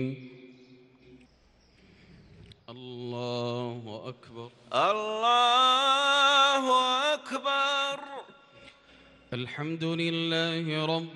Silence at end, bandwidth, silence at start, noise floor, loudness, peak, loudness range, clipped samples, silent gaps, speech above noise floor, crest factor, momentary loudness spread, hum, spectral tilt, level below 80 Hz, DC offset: 0 s; 12 kHz; 0 s; -62 dBFS; -26 LUFS; -12 dBFS; 16 LU; under 0.1%; none; 33 dB; 18 dB; 22 LU; none; -3.5 dB/octave; -70 dBFS; under 0.1%